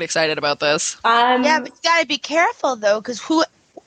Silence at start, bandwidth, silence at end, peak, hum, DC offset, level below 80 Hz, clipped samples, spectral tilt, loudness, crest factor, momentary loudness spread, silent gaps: 0 s; 9.4 kHz; 0.4 s; -2 dBFS; none; under 0.1%; -66 dBFS; under 0.1%; -2 dB/octave; -18 LUFS; 16 dB; 5 LU; none